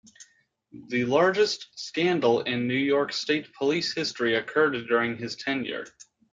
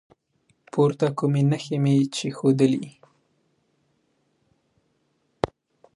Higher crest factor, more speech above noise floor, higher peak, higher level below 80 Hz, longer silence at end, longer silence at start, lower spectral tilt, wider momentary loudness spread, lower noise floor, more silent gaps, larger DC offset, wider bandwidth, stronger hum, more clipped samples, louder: about the same, 18 dB vs 22 dB; second, 38 dB vs 48 dB; second, -8 dBFS vs -4 dBFS; second, -70 dBFS vs -58 dBFS; about the same, 0.45 s vs 0.5 s; second, 0.2 s vs 0.75 s; second, -4.5 dB/octave vs -7 dB/octave; about the same, 9 LU vs 10 LU; second, -64 dBFS vs -70 dBFS; neither; neither; second, 7.8 kHz vs 11.5 kHz; neither; neither; second, -26 LUFS vs -23 LUFS